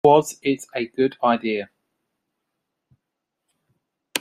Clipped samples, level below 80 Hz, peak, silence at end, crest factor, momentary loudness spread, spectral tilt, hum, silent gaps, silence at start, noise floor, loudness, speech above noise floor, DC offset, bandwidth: under 0.1%; -66 dBFS; -2 dBFS; 0 s; 22 dB; 11 LU; -4.5 dB/octave; none; none; 0.05 s; -81 dBFS; -22 LUFS; 61 dB; under 0.1%; 15 kHz